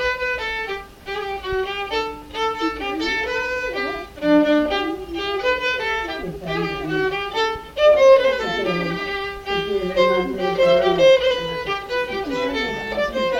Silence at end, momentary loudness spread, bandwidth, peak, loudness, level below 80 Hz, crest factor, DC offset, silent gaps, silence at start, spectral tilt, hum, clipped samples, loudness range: 0 s; 12 LU; 16 kHz; -4 dBFS; -20 LUFS; -44 dBFS; 18 dB; under 0.1%; none; 0 s; -5 dB/octave; none; under 0.1%; 6 LU